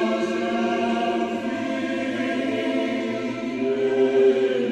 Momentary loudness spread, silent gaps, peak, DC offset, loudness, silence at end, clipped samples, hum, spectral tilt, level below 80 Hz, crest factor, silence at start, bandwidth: 8 LU; none; -8 dBFS; under 0.1%; -23 LUFS; 0 s; under 0.1%; none; -5.5 dB/octave; -64 dBFS; 14 dB; 0 s; 9.4 kHz